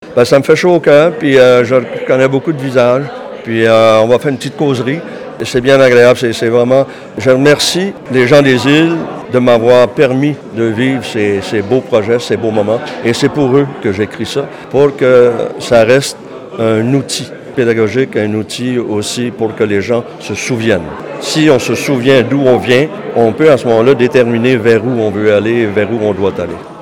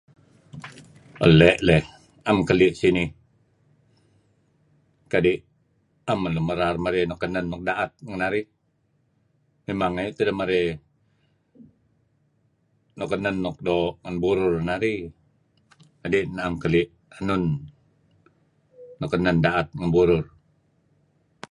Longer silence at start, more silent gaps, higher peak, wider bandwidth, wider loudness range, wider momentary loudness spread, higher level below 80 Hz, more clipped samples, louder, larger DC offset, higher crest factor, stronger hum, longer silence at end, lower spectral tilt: second, 0 s vs 0.55 s; neither; about the same, 0 dBFS vs 0 dBFS; first, 16.5 kHz vs 11 kHz; second, 5 LU vs 9 LU; second, 10 LU vs 17 LU; about the same, -48 dBFS vs -46 dBFS; first, 0.7% vs under 0.1%; first, -11 LUFS vs -23 LUFS; neither; second, 10 dB vs 24 dB; neither; second, 0 s vs 1.25 s; second, -5.5 dB/octave vs -7 dB/octave